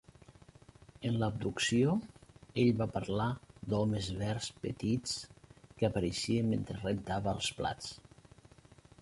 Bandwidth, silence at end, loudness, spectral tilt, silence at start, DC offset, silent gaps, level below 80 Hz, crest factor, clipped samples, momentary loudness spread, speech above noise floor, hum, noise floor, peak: 11.5 kHz; 1.05 s; -34 LUFS; -5.5 dB/octave; 0.3 s; under 0.1%; none; -56 dBFS; 20 dB; under 0.1%; 11 LU; 26 dB; none; -60 dBFS; -16 dBFS